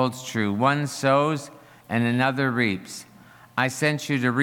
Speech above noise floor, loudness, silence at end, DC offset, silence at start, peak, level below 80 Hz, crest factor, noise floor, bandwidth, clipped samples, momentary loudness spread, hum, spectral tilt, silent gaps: 23 dB; -24 LUFS; 0 s; under 0.1%; 0 s; -6 dBFS; -68 dBFS; 18 dB; -46 dBFS; 17.5 kHz; under 0.1%; 10 LU; none; -5.5 dB/octave; none